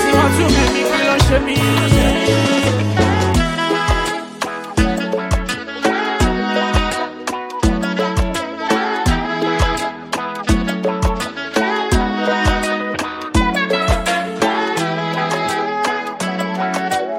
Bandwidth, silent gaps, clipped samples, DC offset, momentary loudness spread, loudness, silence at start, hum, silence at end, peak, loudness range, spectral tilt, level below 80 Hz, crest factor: 16.5 kHz; none; under 0.1%; under 0.1%; 8 LU; -17 LUFS; 0 s; none; 0 s; 0 dBFS; 4 LU; -5 dB/octave; -26 dBFS; 16 dB